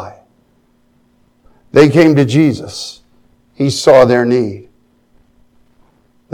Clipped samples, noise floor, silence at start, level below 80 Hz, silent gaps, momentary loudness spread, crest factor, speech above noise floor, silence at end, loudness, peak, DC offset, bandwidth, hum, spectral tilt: 0.3%; -55 dBFS; 0 s; -50 dBFS; none; 19 LU; 14 dB; 45 dB; 1.7 s; -11 LUFS; 0 dBFS; under 0.1%; 14 kHz; none; -6 dB/octave